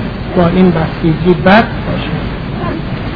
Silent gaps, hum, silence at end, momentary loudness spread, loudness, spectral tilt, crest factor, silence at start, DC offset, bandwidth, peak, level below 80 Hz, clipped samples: none; none; 0 s; 11 LU; -12 LUFS; -9.5 dB/octave; 12 dB; 0 s; under 0.1%; 5.4 kHz; 0 dBFS; -26 dBFS; 0.6%